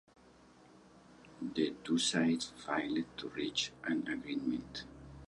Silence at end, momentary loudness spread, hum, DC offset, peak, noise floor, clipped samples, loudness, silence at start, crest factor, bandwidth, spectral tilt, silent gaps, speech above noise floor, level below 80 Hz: 0.05 s; 12 LU; none; under 0.1%; -18 dBFS; -62 dBFS; under 0.1%; -36 LUFS; 0.7 s; 20 dB; 11.5 kHz; -3.5 dB/octave; none; 25 dB; -66 dBFS